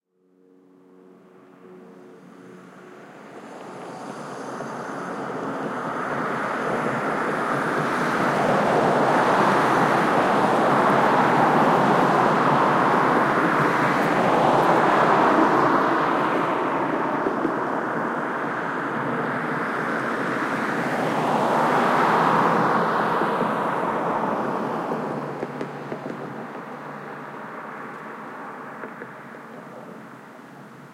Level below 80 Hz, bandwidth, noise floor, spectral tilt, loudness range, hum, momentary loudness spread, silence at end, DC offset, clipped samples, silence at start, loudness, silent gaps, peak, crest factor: -62 dBFS; 16.5 kHz; -60 dBFS; -6 dB/octave; 17 LU; none; 18 LU; 0 s; under 0.1%; under 0.1%; 1.65 s; -21 LUFS; none; -4 dBFS; 18 dB